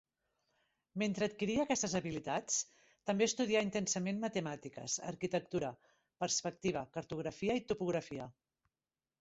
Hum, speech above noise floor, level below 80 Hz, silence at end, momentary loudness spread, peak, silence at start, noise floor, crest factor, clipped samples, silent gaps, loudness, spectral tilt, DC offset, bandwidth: none; over 53 dB; -70 dBFS; 0.9 s; 11 LU; -20 dBFS; 0.95 s; under -90 dBFS; 18 dB; under 0.1%; none; -37 LUFS; -4.5 dB/octave; under 0.1%; 8 kHz